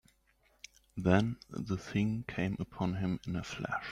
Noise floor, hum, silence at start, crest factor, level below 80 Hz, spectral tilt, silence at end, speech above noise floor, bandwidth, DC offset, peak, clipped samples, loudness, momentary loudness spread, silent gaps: -71 dBFS; none; 0.95 s; 22 dB; -58 dBFS; -7 dB/octave; 0 s; 37 dB; 10.5 kHz; under 0.1%; -12 dBFS; under 0.1%; -35 LUFS; 16 LU; none